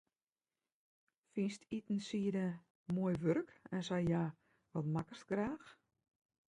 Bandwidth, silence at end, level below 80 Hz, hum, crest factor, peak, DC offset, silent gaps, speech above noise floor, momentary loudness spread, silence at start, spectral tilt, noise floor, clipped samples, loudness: 10.5 kHz; 0.8 s; -70 dBFS; none; 18 dB; -22 dBFS; under 0.1%; 2.70-2.86 s; over 51 dB; 9 LU; 1.35 s; -7 dB/octave; under -90 dBFS; under 0.1%; -40 LUFS